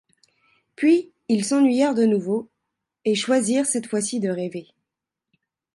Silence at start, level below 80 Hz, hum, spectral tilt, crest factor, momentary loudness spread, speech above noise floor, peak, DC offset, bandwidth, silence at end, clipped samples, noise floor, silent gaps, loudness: 0.8 s; -74 dBFS; none; -4.5 dB/octave; 16 dB; 10 LU; 64 dB; -8 dBFS; under 0.1%; 11.5 kHz; 1.15 s; under 0.1%; -85 dBFS; none; -22 LUFS